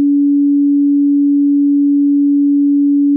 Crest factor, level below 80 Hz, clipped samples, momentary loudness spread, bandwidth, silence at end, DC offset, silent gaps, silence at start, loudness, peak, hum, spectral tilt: 4 dB; under -90 dBFS; under 0.1%; 0 LU; 0.4 kHz; 0 s; under 0.1%; none; 0 s; -12 LUFS; -8 dBFS; none; -16.5 dB/octave